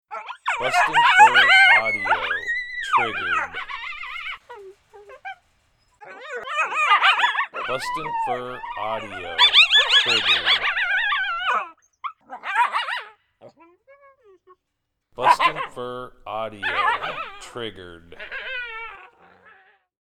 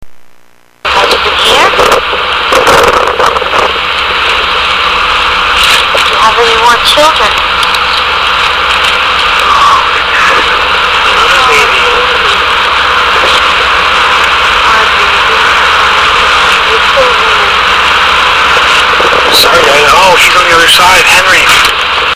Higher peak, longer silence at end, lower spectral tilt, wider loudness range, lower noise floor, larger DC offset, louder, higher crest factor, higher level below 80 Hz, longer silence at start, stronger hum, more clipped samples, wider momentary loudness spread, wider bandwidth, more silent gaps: about the same, 0 dBFS vs 0 dBFS; first, 1.05 s vs 0 s; about the same, -1 dB/octave vs -1 dB/octave; first, 13 LU vs 3 LU; first, -78 dBFS vs -41 dBFS; neither; second, -19 LUFS vs -5 LUFS; first, 22 dB vs 6 dB; second, -56 dBFS vs -30 dBFS; about the same, 0.1 s vs 0 s; neither; second, under 0.1% vs 2%; first, 22 LU vs 5 LU; second, 15.5 kHz vs over 20 kHz; neither